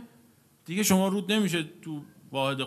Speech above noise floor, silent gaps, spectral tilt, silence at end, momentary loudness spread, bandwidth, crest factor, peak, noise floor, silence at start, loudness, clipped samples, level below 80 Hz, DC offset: 33 dB; none; -4.5 dB/octave; 0 s; 16 LU; 14 kHz; 20 dB; -8 dBFS; -60 dBFS; 0 s; -27 LUFS; under 0.1%; -68 dBFS; under 0.1%